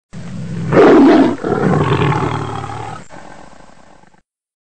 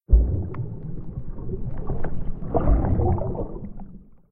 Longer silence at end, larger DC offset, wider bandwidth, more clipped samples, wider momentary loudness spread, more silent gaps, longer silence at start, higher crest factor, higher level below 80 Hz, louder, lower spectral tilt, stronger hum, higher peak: second, 0.1 s vs 0.3 s; first, 2% vs under 0.1%; first, 9 kHz vs 2.4 kHz; neither; first, 21 LU vs 15 LU; neither; about the same, 0.1 s vs 0.1 s; second, 14 dB vs 20 dB; second, -42 dBFS vs -26 dBFS; first, -12 LUFS vs -27 LUFS; second, -7.5 dB/octave vs -14 dB/octave; neither; first, 0 dBFS vs -4 dBFS